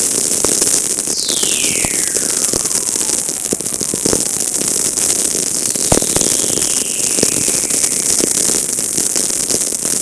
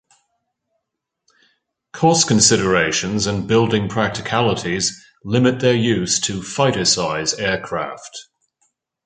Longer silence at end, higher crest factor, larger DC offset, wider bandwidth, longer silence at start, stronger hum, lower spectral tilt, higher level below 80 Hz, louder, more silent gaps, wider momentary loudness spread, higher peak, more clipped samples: second, 0 s vs 0.85 s; about the same, 16 dB vs 20 dB; neither; first, 11 kHz vs 9.6 kHz; second, 0 s vs 1.95 s; neither; second, -1 dB/octave vs -3.5 dB/octave; first, -42 dBFS vs -48 dBFS; first, -12 LUFS vs -17 LUFS; neither; second, 3 LU vs 11 LU; about the same, 0 dBFS vs 0 dBFS; neither